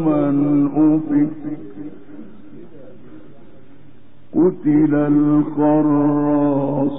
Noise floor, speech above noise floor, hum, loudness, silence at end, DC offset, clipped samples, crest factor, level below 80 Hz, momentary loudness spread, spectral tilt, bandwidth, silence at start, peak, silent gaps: -48 dBFS; 32 dB; none; -16 LUFS; 0 s; 2%; under 0.1%; 12 dB; -60 dBFS; 15 LU; -7.5 dB/octave; 3.2 kHz; 0 s; -6 dBFS; none